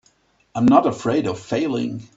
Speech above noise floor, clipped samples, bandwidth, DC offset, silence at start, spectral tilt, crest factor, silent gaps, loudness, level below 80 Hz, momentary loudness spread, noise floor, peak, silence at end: 41 dB; under 0.1%; 8 kHz; under 0.1%; 0.55 s; -7 dB/octave; 20 dB; none; -20 LUFS; -56 dBFS; 10 LU; -61 dBFS; 0 dBFS; 0.1 s